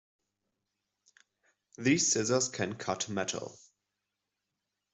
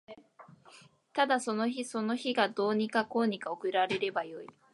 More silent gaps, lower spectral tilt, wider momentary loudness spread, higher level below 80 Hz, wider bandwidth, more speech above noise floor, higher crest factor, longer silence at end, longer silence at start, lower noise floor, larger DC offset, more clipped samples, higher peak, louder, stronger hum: neither; about the same, -3 dB/octave vs -4 dB/octave; first, 10 LU vs 7 LU; first, -74 dBFS vs -80 dBFS; second, 8.2 kHz vs 11.5 kHz; first, 55 dB vs 27 dB; about the same, 22 dB vs 18 dB; first, 1.4 s vs 0.25 s; first, 1.8 s vs 0.1 s; first, -86 dBFS vs -58 dBFS; neither; neither; about the same, -14 dBFS vs -14 dBFS; about the same, -30 LUFS vs -31 LUFS; neither